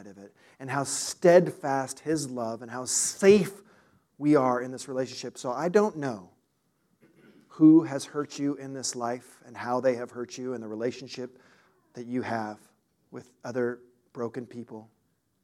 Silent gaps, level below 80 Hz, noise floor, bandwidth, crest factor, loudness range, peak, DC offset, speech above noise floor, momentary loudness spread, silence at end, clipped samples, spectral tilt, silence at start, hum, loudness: none; -74 dBFS; -73 dBFS; 14.5 kHz; 22 dB; 11 LU; -6 dBFS; under 0.1%; 46 dB; 22 LU; 0.6 s; under 0.1%; -5 dB/octave; 0 s; none; -27 LUFS